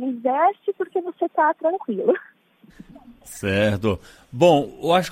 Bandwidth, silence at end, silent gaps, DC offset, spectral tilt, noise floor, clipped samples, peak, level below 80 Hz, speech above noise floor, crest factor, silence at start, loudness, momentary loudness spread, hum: 16 kHz; 0 s; none; under 0.1%; -6 dB/octave; -49 dBFS; under 0.1%; -4 dBFS; -54 dBFS; 28 dB; 18 dB; 0 s; -21 LUFS; 11 LU; none